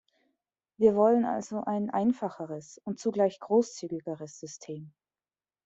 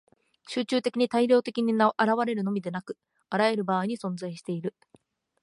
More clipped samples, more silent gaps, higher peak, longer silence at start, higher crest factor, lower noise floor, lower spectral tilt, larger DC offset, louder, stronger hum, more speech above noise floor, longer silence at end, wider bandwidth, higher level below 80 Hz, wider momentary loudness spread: neither; neither; about the same, -10 dBFS vs -8 dBFS; first, 0.8 s vs 0.5 s; about the same, 20 dB vs 18 dB; first, under -90 dBFS vs -63 dBFS; about the same, -6.5 dB/octave vs -6 dB/octave; neither; about the same, -28 LUFS vs -27 LUFS; neither; first, over 61 dB vs 37 dB; about the same, 0.75 s vs 0.7 s; second, 8 kHz vs 11.5 kHz; first, -72 dBFS vs -78 dBFS; first, 18 LU vs 12 LU